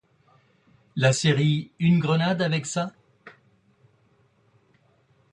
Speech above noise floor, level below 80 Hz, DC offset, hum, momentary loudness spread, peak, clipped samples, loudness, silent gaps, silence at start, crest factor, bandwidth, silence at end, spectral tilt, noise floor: 41 dB; -62 dBFS; under 0.1%; none; 9 LU; -6 dBFS; under 0.1%; -23 LUFS; none; 0.95 s; 20 dB; 11 kHz; 2.05 s; -5.5 dB/octave; -63 dBFS